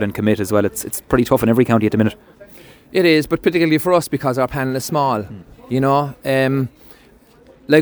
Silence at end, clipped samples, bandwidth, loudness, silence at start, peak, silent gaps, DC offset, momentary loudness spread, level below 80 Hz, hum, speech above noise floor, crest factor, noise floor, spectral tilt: 0 s; under 0.1%; over 20 kHz; -17 LUFS; 0 s; 0 dBFS; none; under 0.1%; 8 LU; -46 dBFS; none; 32 dB; 18 dB; -48 dBFS; -6 dB/octave